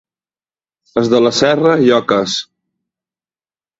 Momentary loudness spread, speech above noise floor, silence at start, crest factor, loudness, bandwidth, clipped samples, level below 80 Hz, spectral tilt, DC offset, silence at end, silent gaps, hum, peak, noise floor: 9 LU; over 78 dB; 0.95 s; 16 dB; -13 LUFS; 8 kHz; under 0.1%; -56 dBFS; -4.5 dB/octave; under 0.1%; 1.35 s; none; none; 0 dBFS; under -90 dBFS